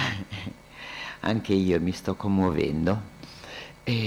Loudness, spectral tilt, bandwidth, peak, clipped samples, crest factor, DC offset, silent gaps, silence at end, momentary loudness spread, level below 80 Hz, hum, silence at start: -27 LUFS; -6.5 dB/octave; 14 kHz; -12 dBFS; under 0.1%; 16 dB; under 0.1%; none; 0 s; 16 LU; -50 dBFS; none; 0 s